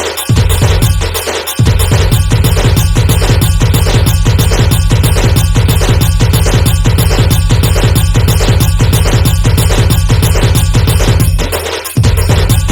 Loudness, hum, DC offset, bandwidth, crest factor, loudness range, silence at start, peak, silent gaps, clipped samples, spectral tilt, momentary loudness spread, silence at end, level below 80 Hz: -10 LUFS; none; under 0.1%; 20 kHz; 8 dB; 1 LU; 0 s; 0 dBFS; none; 0.3%; -5 dB/octave; 2 LU; 0 s; -14 dBFS